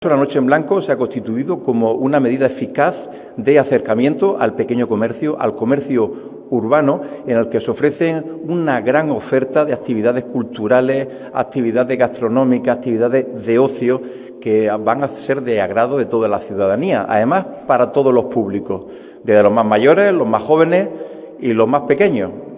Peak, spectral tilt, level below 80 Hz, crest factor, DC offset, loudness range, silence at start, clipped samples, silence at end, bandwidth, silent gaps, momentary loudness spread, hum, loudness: 0 dBFS; -11 dB/octave; -56 dBFS; 16 dB; under 0.1%; 3 LU; 0 s; under 0.1%; 0 s; 4 kHz; none; 9 LU; none; -16 LUFS